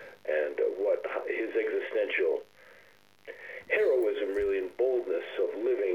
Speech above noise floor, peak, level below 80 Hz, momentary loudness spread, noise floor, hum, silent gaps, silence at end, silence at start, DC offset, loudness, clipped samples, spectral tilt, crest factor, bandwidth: 30 dB; -14 dBFS; -64 dBFS; 7 LU; -60 dBFS; none; none; 0 s; 0 s; under 0.1%; -30 LUFS; under 0.1%; -5 dB/octave; 16 dB; 17 kHz